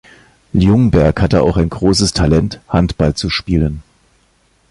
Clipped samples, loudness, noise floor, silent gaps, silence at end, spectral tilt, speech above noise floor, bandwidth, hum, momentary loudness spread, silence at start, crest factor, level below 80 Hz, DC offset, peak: under 0.1%; -14 LUFS; -56 dBFS; none; 0.9 s; -6 dB/octave; 43 dB; 11.5 kHz; none; 7 LU; 0.55 s; 14 dB; -26 dBFS; under 0.1%; 0 dBFS